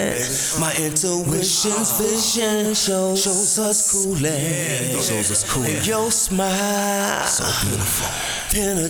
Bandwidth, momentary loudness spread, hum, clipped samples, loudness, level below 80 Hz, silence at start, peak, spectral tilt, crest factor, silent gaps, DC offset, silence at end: over 20 kHz; 4 LU; none; under 0.1%; -19 LUFS; -42 dBFS; 0 s; -4 dBFS; -2.5 dB/octave; 16 dB; none; under 0.1%; 0 s